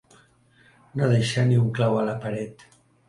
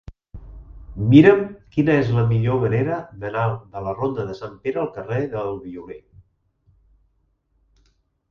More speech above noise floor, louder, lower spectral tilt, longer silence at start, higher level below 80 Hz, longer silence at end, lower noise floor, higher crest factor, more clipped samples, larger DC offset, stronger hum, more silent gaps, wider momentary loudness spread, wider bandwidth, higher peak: second, 36 dB vs 47 dB; second, -23 LUFS vs -20 LUFS; second, -7 dB/octave vs -9.5 dB/octave; first, 0.95 s vs 0.1 s; second, -60 dBFS vs -46 dBFS; second, 0.55 s vs 2.3 s; second, -58 dBFS vs -66 dBFS; second, 16 dB vs 22 dB; neither; neither; neither; neither; second, 12 LU vs 18 LU; first, 11.5 kHz vs 6.6 kHz; second, -8 dBFS vs 0 dBFS